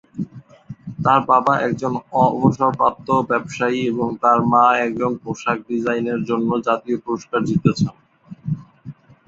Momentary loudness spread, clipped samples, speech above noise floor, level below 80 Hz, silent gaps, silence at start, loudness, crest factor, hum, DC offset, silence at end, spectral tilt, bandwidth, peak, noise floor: 13 LU; under 0.1%; 21 dB; -54 dBFS; none; 0.15 s; -19 LUFS; 18 dB; none; under 0.1%; 0.35 s; -7 dB/octave; 7.8 kHz; -2 dBFS; -40 dBFS